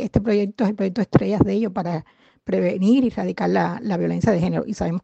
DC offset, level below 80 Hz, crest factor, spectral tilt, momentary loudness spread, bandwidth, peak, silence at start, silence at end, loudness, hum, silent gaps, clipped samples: under 0.1%; -44 dBFS; 20 dB; -8 dB/octave; 7 LU; 8.2 kHz; 0 dBFS; 0 s; 0.05 s; -21 LUFS; none; none; under 0.1%